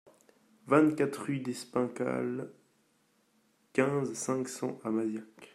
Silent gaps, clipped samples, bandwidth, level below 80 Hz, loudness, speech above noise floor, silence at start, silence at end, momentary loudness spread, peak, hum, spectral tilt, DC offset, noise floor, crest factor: none; under 0.1%; 15.5 kHz; -78 dBFS; -32 LUFS; 40 dB; 0.65 s; 0.1 s; 11 LU; -10 dBFS; none; -6 dB/octave; under 0.1%; -71 dBFS; 24 dB